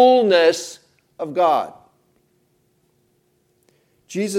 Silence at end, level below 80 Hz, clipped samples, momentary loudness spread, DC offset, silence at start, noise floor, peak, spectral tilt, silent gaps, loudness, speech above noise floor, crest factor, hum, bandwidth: 0 s; -74 dBFS; under 0.1%; 19 LU; under 0.1%; 0 s; -64 dBFS; -4 dBFS; -4 dB/octave; none; -18 LUFS; 48 dB; 18 dB; none; 13.5 kHz